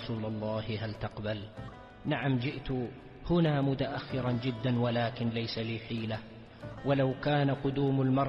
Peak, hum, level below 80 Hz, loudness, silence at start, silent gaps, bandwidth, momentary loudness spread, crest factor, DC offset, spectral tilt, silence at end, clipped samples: -18 dBFS; none; -54 dBFS; -32 LUFS; 0 s; none; 6 kHz; 12 LU; 14 dB; under 0.1%; -9 dB/octave; 0 s; under 0.1%